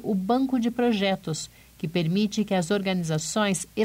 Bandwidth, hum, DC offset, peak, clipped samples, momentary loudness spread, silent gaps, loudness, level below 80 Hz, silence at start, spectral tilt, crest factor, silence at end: 16 kHz; none; under 0.1%; -12 dBFS; under 0.1%; 8 LU; none; -25 LUFS; -58 dBFS; 0 s; -5 dB/octave; 12 dB; 0 s